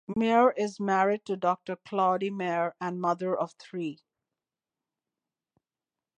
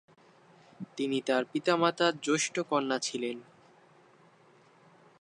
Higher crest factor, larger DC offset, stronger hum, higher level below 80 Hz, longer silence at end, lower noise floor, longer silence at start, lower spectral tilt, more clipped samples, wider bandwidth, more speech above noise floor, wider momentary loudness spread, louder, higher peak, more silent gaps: about the same, 20 dB vs 22 dB; neither; neither; first, -72 dBFS vs -84 dBFS; first, 2.25 s vs 1.8 s; first, under -90 dBFS vs -61 dBFS; second, 0.1 s vs 0.8 s; first, -6.5 dB/octave vs -3.5 dB/octave; neither; second, 9.8 kHz vs 11 kHz; first, over 62 dB vs 31 dB; about the same, 12 LU vs 12 LU; about the same, -28 LUFS vs -30 LUFS; about the same, -10 dBFS vs -12 dBFS; neither